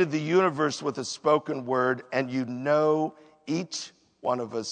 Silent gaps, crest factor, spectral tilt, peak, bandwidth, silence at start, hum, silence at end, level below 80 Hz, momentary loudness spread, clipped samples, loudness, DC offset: none; 18 dB; -5 dB/octave; -8 dBFS; 9.4 kHz; 0 s; none; 0 s; -78 dBFS; 11 LU; under 0.1%; -27 LUFS; under 0.1%